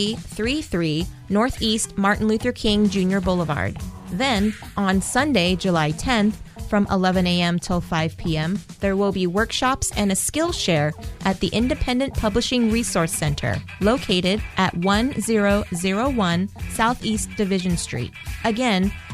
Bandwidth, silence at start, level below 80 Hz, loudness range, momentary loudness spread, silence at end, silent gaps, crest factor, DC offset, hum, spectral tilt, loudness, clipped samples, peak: 15.5 kHz; 0 s; -36 dBFS; 1 LU; 6 LU; 0 s; none; 16 dB; under 0.1%; none; -4.5 dB/octave; -21 LUFS; under 0.1%; -6 dBFS